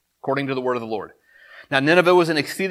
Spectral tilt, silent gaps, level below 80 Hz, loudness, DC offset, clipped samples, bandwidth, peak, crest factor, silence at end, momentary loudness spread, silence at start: -5.5 dB/octave; none; -70 dBFS; -20 LUFS; under 0.1%; under 0.1%; 15 kHz; 0 dBFS; 20 dB; 0 s; 15 LU; 0.25 s